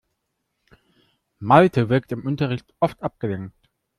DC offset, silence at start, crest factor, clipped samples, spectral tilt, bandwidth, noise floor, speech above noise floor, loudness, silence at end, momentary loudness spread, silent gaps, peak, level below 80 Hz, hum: under 0.1%; 1.4 s; 22 dB; under 0.1%; -8.5 dB/octave; 12.5 kHz; -76 dBFS; 56 dB; -21 LUFS; 0.5 s; 16 LU; none; -2 dBFS; -56 dBFS; none